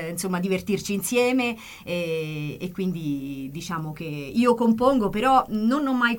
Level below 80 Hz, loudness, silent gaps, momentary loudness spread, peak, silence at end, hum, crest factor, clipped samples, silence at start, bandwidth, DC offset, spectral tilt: -52 dBFS; -24 LUFS; none; 11 LU; -6 dBFS; 0 s; none; 18 dB; under 0.1%; 0 s; 17 kHz; under 0.1%; -5 dB/octave